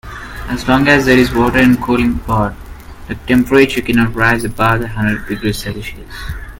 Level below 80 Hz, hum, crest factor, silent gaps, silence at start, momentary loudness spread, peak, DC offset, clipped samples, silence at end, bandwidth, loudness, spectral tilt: -30 dBFS; none; 14 dB; none; 0.05 s; 17 LU; 0 dBFS; under 0.1%; under 0.1%; 0.05 s; 17.5 kHz; -13 LUFS; -6 dB/octave